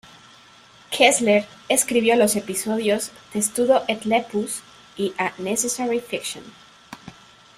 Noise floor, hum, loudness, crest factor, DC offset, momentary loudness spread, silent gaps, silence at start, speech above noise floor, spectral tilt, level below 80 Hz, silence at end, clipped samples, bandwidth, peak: -50 dBFS; none; -21 LUFS; 22 dB; under 0.1%; 14 LU; none; 0.9 s; 28 dB; -2.5 dB/octave; -64 dBFS; 0.45 s; under 0.1%; 16 kHz; -2 dBFS